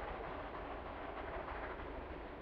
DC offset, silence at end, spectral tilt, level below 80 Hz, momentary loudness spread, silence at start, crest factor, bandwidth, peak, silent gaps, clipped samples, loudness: under 0.1%; 0 s; -4.5 dB/octave; -54 dBFS; 3 LU; 0 s; 14 dB; 6.2 kHz; -32 dBFS; none; under 0.1%; -46 LUFS